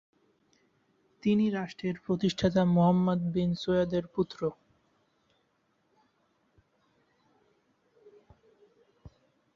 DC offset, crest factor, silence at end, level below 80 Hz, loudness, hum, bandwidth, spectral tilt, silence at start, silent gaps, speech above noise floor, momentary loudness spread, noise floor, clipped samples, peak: under 0.1%; 20 dB; 0.5 s; -60 dBFS; -29 LUFS; none; 7.4 kHz; -7.5 dB/octave; 1.25 s; none; 46 dB; 10 LU; -74 dBFS; under 0.1%; -12 dBFS